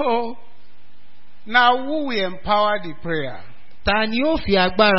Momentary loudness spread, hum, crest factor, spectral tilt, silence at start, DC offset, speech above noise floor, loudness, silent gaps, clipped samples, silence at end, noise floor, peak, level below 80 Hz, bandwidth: 11 LU; none; 20 dB; -8.5 dB/octave; 0 s; 4%; 36 dB; -20 LUFS; none; under 0.1%; 0 s; -55 dBFS; 0 dBFS; -42 dBFS; 5.8 kHz